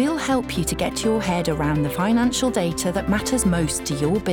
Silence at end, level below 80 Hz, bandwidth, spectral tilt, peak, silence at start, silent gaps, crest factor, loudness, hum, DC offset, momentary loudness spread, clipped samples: 0 s; -38 dBFS; over 20 kHz; -5 dB/octave; -10 dBFS; 0 s; none; 12 dB; -22 LUFS; none; under 0.1%; 3 LU; under 0.1%